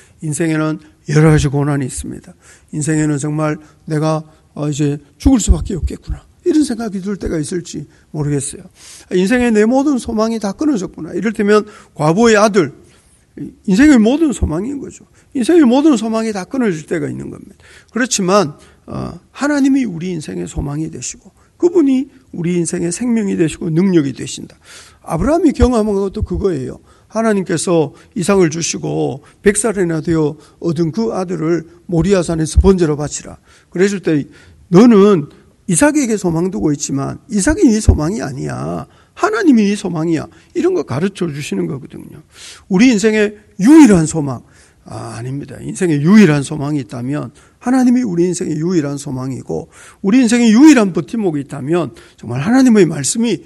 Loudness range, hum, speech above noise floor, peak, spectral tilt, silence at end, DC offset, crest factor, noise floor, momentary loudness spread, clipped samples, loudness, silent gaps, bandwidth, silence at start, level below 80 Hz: 5 LU; none; 35 dB; 0 dBFS; -6 dB/octave; 0.05 s; under 0.1%; 14 dB; -49 dBFS; 16 LU; 0.3%; -14 LUFS; none; 12 kHz; 0.2 s; -30 dBFS